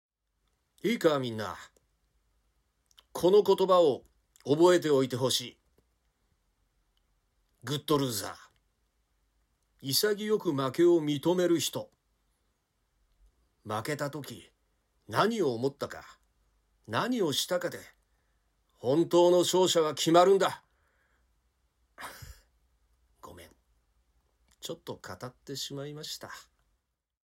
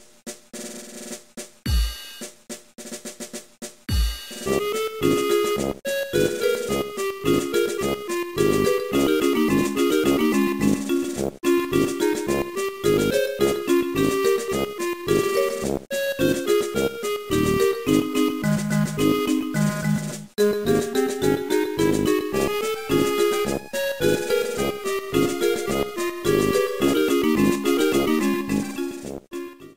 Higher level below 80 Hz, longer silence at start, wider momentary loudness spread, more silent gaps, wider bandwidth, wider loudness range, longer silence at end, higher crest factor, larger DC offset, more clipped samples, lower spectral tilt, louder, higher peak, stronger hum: second, -68 dBFS vs -38 dBFS; first, 0.85 s vs 0.25 s; first, 21 LU vs 15 LU; neither; about the same, 16 kHz vs 16 kHz; first, 15 LU vs 4 LU; first, 0.9 s vs 0.05 s; first, 22 dB vs 16 dB; second, under 0.1% vs 0.3%; neither; about the same, -4.5 dB/octave vs -5 dB/octave; second, -28 LUFS vs -22 LUFS; second, -10 dBFS vs -6 dBFS; neither